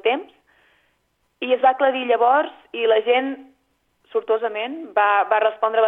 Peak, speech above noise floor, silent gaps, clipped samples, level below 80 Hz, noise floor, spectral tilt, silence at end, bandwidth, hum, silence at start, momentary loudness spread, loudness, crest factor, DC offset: -4 dBFS; 49 dB; none; under 0.1%; -76 dBFS; -68 dBFS; -5 dB/octave; 0 s; 4 kHz; 60 Hz at -80 dBFS; 0.05 s; 11 LU; -20 LUFS; 16 dB; under 0.1%